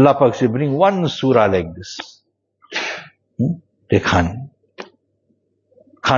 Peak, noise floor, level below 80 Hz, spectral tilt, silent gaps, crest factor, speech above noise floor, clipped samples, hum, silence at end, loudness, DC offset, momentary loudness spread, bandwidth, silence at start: 0 dBFS; -65 dBFS; -46 dBFS; -6.5 dB/octave; none; 18 dB; 49 dB; under 0.1%; none; 0 s; -18 LUFS; under 0.1%; 22 LU; 7.4 kHz; 0 s